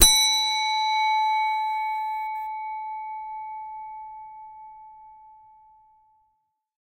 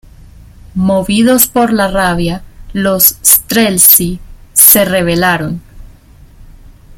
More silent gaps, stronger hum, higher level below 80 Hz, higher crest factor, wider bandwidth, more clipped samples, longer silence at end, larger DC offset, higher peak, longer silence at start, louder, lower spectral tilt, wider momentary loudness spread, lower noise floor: neither; neither; second, -44 dBFS vs -32 dBFS; first, 26 dB vs 12 dB; second, 16 kHz vs over 20 kHz; second, under 0.1% vs 1%; first, 1.5 s vs 0.5 s; neither; about the same, 0 dBFS vs 0 dBFS; second, 0 s vs 0.75 s; second, -24 LUFS vs -8 LUFS; second, 1 dB/octave vs -3 dB/octave; first, 22 LU vs 17 LU; first, -73 dBFS vs -38 dBFS